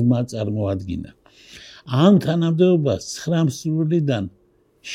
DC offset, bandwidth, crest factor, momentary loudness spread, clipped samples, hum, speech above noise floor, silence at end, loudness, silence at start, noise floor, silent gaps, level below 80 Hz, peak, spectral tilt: under 0.1%; 13.5 kHz; 16 dB; 18 LU; under 0.1%; none; 25 dB; 0 s; -20 LUFS; 0 s; -45 dBFS; none; -52 dBFS; -4 dBFS; -7 dB/octave